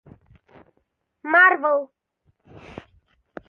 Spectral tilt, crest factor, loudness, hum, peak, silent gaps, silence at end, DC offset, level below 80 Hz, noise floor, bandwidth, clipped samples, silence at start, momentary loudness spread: -6 dB/octave; 22 dB; -17 LUFS; none; -4 dBFS; none; 1.65 s; under 0.1%; -62 dBFS; -72 dBFS; 6.4 kHz; under 0.1%; 1.25 s; 28 LU